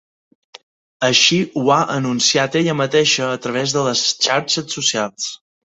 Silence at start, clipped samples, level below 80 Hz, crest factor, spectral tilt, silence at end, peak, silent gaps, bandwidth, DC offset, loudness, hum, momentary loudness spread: 1 s; under 0.1%; -60 dBFS; 18 dB; -3 dB/octave; 0.4 s; 0 dBFS; none; 8.4 kHz; under 0.1%; -16 LUFS; none; 8 LU